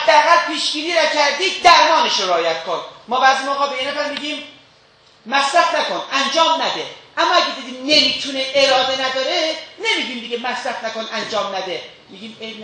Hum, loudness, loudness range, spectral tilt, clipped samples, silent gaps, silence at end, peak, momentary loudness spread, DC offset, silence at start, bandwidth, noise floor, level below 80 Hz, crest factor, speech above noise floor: none; -17 LUFS; 5 LU; -1 dB/octave; under 0.1%; none; 0 s; 0 dBFS; 13 LU; under 0.1%; 0 s; 10 kHz; -51 dBFS; -62 dBFS; 18 dB; 33 dB